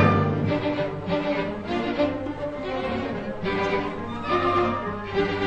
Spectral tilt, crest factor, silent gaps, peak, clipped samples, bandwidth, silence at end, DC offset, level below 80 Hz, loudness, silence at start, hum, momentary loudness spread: -7.5 dB/octave; 18 dB; none; -6 dBFS; under 0.1%; 8.6 kHz; 0 s; under 0.1%; -46 dBFS; -26 LUFS; 0 s; none; 8 LU